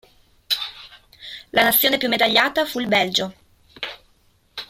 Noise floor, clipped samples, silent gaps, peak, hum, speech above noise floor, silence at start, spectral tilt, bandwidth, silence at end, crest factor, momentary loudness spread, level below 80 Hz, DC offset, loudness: -59 dBFS; under 0.1%; none; -2 dBFS; none; 41 dB; 0.5 s; -2.5 dB/octave; 16.5 kHz; 0.05 s; 20 dB; 20 LU; -58 dBFS; under 0.1%; -18 LUFS